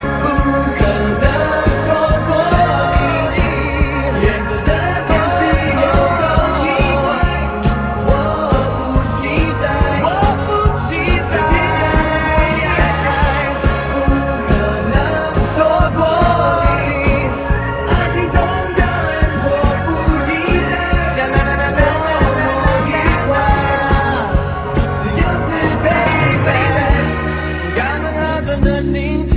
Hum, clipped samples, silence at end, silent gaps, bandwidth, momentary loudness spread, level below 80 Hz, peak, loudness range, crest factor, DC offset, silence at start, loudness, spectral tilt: none; under 0.1%; 0 s; none; 4 kHz; 4 LU; -20 dBFS; 0 dBFS; 1 LU; 14 dB; under 0.1%; 0 s; -15 LUFS; -10.5 dB/octave